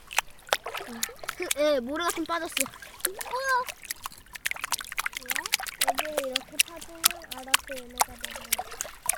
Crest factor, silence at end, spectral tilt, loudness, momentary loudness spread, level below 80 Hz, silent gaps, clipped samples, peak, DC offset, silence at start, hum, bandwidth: 30 dB; 0 s; 0 dB/octave; -29 LUFS; 10 LU; -58 dBFS; none; under 0.1%; 0 dBFS; under 0.1%; 0 s; none; 18 kHz